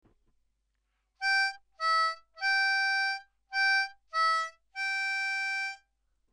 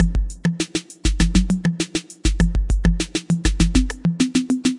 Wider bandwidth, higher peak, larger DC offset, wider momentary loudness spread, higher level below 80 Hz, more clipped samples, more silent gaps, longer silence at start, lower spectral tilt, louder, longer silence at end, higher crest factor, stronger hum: about the same, 12.5 kHz vs 11.5 kHz; second, -20 dBFS vs -2 dBFS; neither; first, 9 LU vs 6 LU; second, -76 dBFS vs -22 dBFS; neither; neither; first, 1.2 s vs 0 s; second, 3.5 dB/octave vs -5 dB/octave; second, -29 LUFS vs -21 LUFS; first, 0.55 s vs 0 s; about the same, 12 dB vs 16 dB; neither